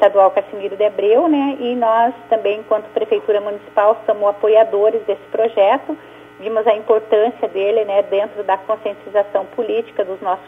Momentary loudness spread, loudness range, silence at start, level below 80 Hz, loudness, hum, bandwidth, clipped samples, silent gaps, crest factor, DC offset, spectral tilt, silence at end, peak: 8 LU; 2 LU; 0 s; -66 dBFS; -17 LUFS; 60 Hz at -55 dBFS; 3.8 kHz; under 0.1%; none; 16 dB; under 0.1%; -6.5 dB/octave; 0 s; 0 dBFS